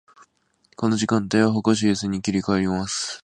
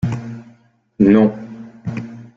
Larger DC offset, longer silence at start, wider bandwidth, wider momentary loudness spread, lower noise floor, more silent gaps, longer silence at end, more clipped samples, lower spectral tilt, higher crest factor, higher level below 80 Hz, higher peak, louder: neither; first, 0.8 s vs 0.05 s; first, 9.8 kHz vs 7.2 kHz; second, 5 LU vs 22 LU; first, -63 dBFS vs -53 dBFS; neither; about the same, 0.05 s vs 0.1 s; neither; second, -5 dB/octave vs -9.5 dB/octave; about the same, 18 dB vs 16 dB; about the same, -52 dBFS vs -50 dBFS; about the same, -4 dBFS vs -2 dBFS; second, -22 LUFS vs -16 LUFS